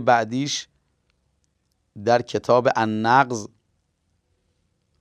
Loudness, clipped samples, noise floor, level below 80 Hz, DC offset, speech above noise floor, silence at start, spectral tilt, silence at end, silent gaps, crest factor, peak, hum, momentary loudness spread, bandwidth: -21 LUFS; under 0.1%; -71 dBFS; -70 dBFS; under 0.1%; 51 dB; 0 s; -4.5 dB/octave; 1.55 s; none; 20 dB; -2 dBFS; none; 11 LU; 11 kHz